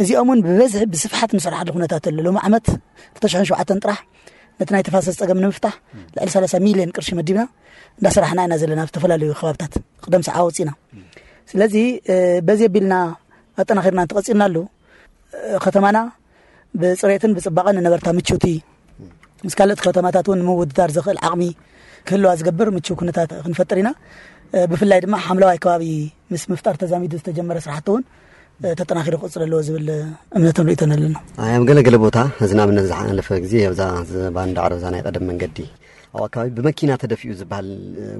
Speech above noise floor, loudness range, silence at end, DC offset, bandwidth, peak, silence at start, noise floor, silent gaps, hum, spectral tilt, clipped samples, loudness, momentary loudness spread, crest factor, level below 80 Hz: 35 dB; 6 LU; 0 s; under 0.1%; 11.5 kHz; -2 dBFS; 0 s; -52 dBFS; none; none; -6 dB/octave; under 0.1%; -18 LUFS; 12 LU; 16 dB; -44 dBFS